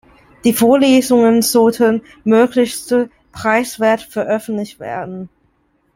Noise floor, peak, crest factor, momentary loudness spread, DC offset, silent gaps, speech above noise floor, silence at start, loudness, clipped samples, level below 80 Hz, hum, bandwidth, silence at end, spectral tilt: -60 dBFS; 0 dBFS; 14 dB; 14 LU; under 0.1%; none; 46 dB; 0.45 s; -14 LUFS; under 0.1%; -54 dBFS; none; 16.5 kHz; 0.7 s; -4.5 dB/octave